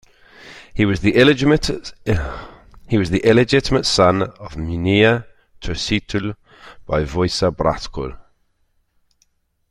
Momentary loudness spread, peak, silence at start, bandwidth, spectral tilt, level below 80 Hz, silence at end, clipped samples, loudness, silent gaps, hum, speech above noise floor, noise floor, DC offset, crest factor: 16 LU; 0 dBFS; 0.4 s; 12.5 kHz; -5.5 dB/octave; -36 dBFS; 1.5 s; under 0.1%; -18 LUFS; none; none; 46 dB; -64 dBFS; under 0.1%; 18 dB